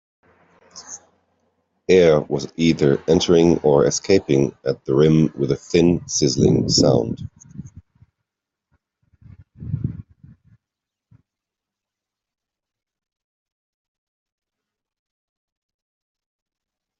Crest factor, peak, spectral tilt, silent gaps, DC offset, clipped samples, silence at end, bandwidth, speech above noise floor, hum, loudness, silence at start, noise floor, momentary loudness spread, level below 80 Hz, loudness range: 20 dB; -2 dBFS; -5.5 dB/octave; none; under 0.1%; under 0.1%; 7 s; 8 kHz; 69 dB; none; -18 LUFS; 0.75 s; -86 dBFS; 22 LU; -50 dBFS; 19 LU